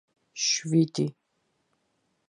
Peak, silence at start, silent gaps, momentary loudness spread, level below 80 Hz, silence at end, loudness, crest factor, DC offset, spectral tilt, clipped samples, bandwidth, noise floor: -12 dBFS; 0.35 s; none; 9 LU; -78 dBFS; 1.2 s; -26 LUFS; 18 dB; under 0.1%; -4 dB/octave; under 0.1%; 10.5 kHz; -75 dBFS